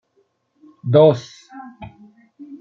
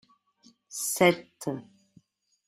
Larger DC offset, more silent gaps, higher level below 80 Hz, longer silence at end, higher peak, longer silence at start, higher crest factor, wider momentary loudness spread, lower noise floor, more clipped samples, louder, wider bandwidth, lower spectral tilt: neither; neither; first, -60 dBFS vs -70 dBFS; second, 0.05 s vs 0.85 s; first, -2 dBFS vs -6 dBFS; first, 0.85 s vs 0.7 s; second, 18 dB vs 24 dB; first, 27 LU vs 17 LU; about the same, -65 dBFS vs -63 dBFS; neither; first, -15 LUFS vs -27 LUFS; second, 7.2 kHz vs 15.5 kHz; first, -8 dB/octave vs -3.5 dB/octave